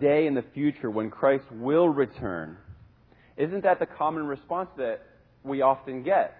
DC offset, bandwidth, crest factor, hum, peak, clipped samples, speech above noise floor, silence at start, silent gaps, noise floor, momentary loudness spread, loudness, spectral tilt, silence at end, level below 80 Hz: under 0.1%; 4.7 kHz; 18 dB; none; -8 dBFS; under 0.1%; 32 dB; 0 s; none; -58 dBFS; 11 LU; -27 LUFS; -10.5 dB/octave; 0.1 s; -60 dBFS